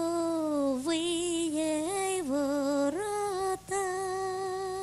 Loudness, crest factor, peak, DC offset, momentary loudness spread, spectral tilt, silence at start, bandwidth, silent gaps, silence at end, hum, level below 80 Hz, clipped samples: -31 LUFS; 12 dB; -20 dBFS; under 0.1%; 4 LU; -3.5 dB/octave; 0 s; 14 kHz; none; 0 s; none; -62 dBFS; under 0.1%